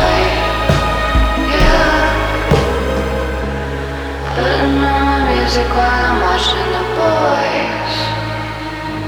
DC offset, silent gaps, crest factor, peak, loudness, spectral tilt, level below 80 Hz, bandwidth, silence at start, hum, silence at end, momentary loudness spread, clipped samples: under 0.1%; none; 14 dB; 0 dBFS; -15 LUFS; -5.5 dB/octave; -22 dBFS; over 20 kHz; 0 s; none; 0 s; 8 LU; under 0.1%